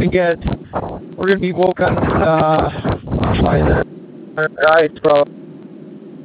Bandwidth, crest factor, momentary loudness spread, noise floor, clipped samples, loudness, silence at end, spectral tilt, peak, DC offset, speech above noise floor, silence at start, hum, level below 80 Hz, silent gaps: 5 kHz; 16 dB; 22 LU; -35 dBFS; under 0.1%; -16 LUFS; 0 s; -10.5 dB/octave; 0 dBFS; under 0.1%; 20 dB; 0 s; none; -30 dBFS; none